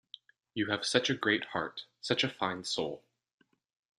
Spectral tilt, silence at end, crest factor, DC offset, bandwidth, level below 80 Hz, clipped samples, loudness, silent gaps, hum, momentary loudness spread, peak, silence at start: -3.5 dB/octave; 1 s; 26 dB; under 0.1%; 12.5 kHz; -72 dBFS; under 0.1%; -32 LUFS; none; none; 15 LU; -10 dBFS; 0.55 s